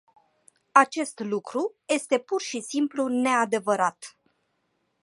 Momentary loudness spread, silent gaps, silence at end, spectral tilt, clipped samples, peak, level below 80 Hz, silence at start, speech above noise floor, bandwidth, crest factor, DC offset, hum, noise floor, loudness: 10 LU; none; 0.95 s; -3.5 dB/octave; under 0.1%; -2 dBFS; -80 dBFS; 0.75 s; 48 dB; 11.5 kHz; 24 dB; under 0.1%; none; -74 dBFS; -25 LUFS